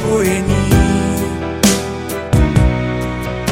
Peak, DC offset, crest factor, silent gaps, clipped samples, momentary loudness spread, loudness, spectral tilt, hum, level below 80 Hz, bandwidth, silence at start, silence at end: 0 dBFS; under 0.1%; 14 dB; none; under 0.1%; 8 LU; -15 LUFS; -5.5 dB/octave; none; -22 dBFS; 17 kHz; 0 s; 0 s